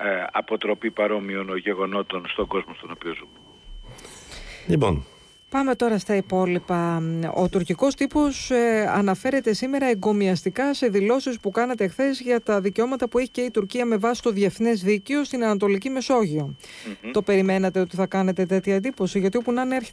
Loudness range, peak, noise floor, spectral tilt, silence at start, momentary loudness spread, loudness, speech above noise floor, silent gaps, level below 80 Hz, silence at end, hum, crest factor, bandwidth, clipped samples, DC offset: 6 LU; -10 dBFS; -43 dBFS; -6 dB/octave; 0 s; 8 LU; -23 LUFS; 20 dB; none; -48 dBFS; 0 s; none; 14 dB; 11 kHz; under 0.1%; under 0.1%